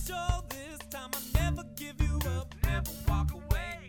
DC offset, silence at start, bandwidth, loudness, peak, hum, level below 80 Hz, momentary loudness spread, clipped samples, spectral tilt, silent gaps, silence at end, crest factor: under 0.1%; 0 s; over 20 kHz; -34 LUFS; -12 dBFS; none; -34 dBFS; 10 LU; under 0.1%; -5 dB/octave; none; 0 s; 20 dB